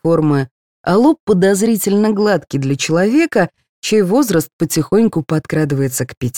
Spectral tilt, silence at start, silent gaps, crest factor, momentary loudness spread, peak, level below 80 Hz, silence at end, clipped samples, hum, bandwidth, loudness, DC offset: -5.5 dB/octave; 0.05 s; 0.51-0.84 s, 1.20-1.27 s, 3.69-3.82 s, 4.53-4.59 s, 6.17-6.21 s; 14 dB; 6 LU; -2 dBFS; -50 dBFS; 0 s; under 0.1%; none; 19 kHz; -15 LUFS; 0.4%